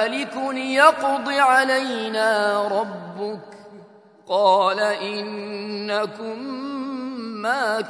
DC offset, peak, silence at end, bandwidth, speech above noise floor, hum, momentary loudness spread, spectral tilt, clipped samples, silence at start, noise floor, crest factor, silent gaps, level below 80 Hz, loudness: under 0.1%; 0 dBFS; 0 s; 11 kHz; 27 dB; none; 15 LU; -3.5 dB/octave; under 0.1%; 0 s; -48 dBFS; 22 dB; none; -78 dBFS; -21 LUFS